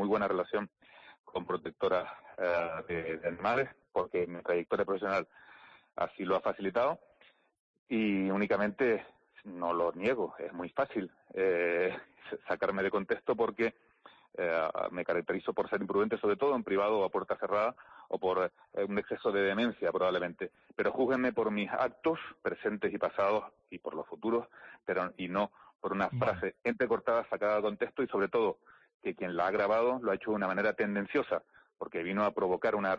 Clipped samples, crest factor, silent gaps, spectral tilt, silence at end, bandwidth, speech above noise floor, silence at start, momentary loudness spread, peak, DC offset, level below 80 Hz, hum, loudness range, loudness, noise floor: under 0.1%; 14 dB; 1.19-1.24 s, 7.60-7.86 s, 25.75-25.79 s, 28.94-29.00 s; -7.5 dB/octave; 0 s; 7 kHz; 33 dB; 0 s; 9 LU; -20 dBFS; under 0.1%; -68 dBFS; none; 3 LU; -33 LUFS; -65 dBFS